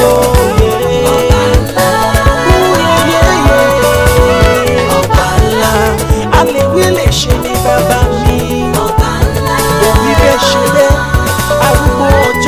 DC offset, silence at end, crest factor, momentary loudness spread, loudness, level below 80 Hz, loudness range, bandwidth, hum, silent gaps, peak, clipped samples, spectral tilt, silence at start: under 0.1%; 0 s; 8 dB; 4 LU; -9 LUFS; -16 dBFS; 2 LU; 16 kHz; none; none; 0 dBFS; 0.6%; -5 dB/octave; 0 s